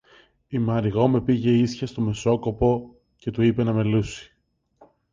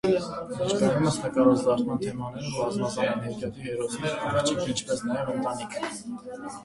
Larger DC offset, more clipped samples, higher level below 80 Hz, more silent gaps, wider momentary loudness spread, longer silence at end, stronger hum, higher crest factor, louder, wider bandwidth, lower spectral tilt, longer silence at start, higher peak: neither; neither; first, -46 dBFS vs -56 dBFS; neither; about the same, 11 LU vs 11 LU; first, 0.9 s vs 0 s; neither; about the same, 18 dB vs 20 dB; first, -23 LUFS vs -27 LUFS; second, 7.6 kHz vs 11.5 kHz; first, -7.5 dB/octave vs -5 dB/octave; first, 0.5 s vs 0.05 s; first, -4 dBFS vs -8 dBFS